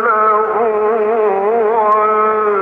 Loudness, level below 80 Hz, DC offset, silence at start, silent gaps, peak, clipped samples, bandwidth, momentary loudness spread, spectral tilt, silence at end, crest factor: -13 LUFS; -64 dBFS; under 0.1%; 0 s; none; -4 dBFS; under 0.1%; 3.8 kHz; 3 LU; -7.5 dB/octave; 0 s; 10 dB